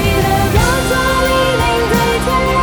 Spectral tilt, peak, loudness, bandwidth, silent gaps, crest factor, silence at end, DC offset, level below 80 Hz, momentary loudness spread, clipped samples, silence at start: -4.5 dB/octave; 0 dBFS; -13 LUFS; over 20 kHz; none; 12 dB; 0 s; under 0.1%; -22 dBFS; 1 LU; under 0.1%; 0 s